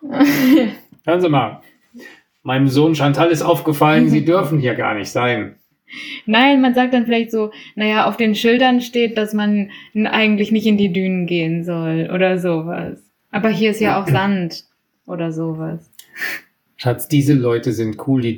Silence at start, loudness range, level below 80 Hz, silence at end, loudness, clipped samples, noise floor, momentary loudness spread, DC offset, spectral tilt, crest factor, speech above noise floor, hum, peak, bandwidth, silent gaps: 0 s; 5 LU; -58 dBFS; 0 s; -17 LUFS; under 0.1%; -41 dBFS; 12 LU; under 0.1%; -6.5 dB/octave; 16 dB; 25 dB; none; 0 dBFS; 19.5 kHz; none